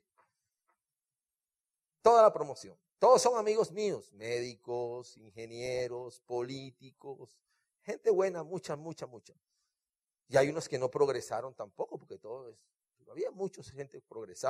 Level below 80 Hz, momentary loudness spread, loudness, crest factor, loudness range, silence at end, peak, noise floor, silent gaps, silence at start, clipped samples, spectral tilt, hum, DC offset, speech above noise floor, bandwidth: -76 dBFS; 22 LU; -32 LUFS; 22 dB; 11 LU; 0 s; -12 dBFS; under -90 dBFS; none; 2.05 s; under 0.1%; -4.5 dB/octave; none; under 0.1%; over 57 dB; 14 kHz